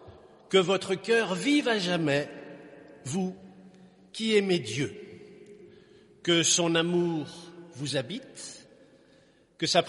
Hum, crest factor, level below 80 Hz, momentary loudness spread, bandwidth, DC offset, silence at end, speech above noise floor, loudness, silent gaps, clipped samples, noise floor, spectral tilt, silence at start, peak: none; 22 dB; -70 dBFS; 22 LU; 11.5 kHz; under 0.1%; 0 s; 34 dB; -27 LUFS; none; under 0.1%; -61 dBFS; -3.5 dB/octave; 0 s; -8 dBFS